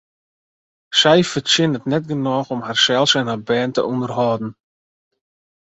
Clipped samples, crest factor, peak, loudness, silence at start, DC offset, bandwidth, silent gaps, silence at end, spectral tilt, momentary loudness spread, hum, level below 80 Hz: under 0.1%; 18 dB; -2 dBFS; -17 LUFS; 0.9 s; under 0.1%; 8.2 kHz; none; 1.15 s; -4 dB/octave; 8 LU; none; -60 dBFS